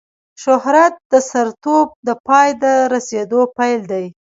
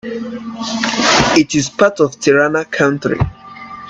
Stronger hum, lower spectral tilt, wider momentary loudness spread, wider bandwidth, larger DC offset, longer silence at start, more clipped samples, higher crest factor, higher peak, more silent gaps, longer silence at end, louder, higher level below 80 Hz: neither; about the same, -4 dB/octave vs -4 dB/octave; second, 8 LU vs 13 LU; second, 7.8 kHz vs 9.8 kHz; neither; first, 0.4 s vs 0.05 s; neither; about the same, 14 dB vs 16 dB; about the same, 0 dBFS vs 0 dBFS; first, 1.05-1.10 s, 1.95-2.03 s, 2.20-2.24 s vs none; first, 0.2 s vs 0 s; about the same, -15 LUFS vs -14 LUFS; second, -64 dBFS vs -40 dBFS